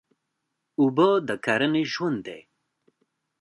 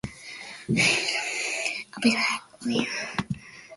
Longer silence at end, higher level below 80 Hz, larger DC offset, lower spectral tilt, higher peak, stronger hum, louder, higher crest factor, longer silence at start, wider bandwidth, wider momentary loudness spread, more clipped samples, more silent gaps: first, 1 s vs 0 s; second, -72 dBFS vs -58 dBFS; neither; first, -6 dB/octave vs -3 dB/octave; about the same, -6 dBFS vs -8 dBFS; neither; about the same, -24 LUFS vs -25 LUFS; about the same, 20 dB vs 20 dB; first, 0.8 s vs 0.05 s; about the same, 11.5 kHz vs 11.5 kHz; about the same, 16 LU vs 16 LU; neither; neither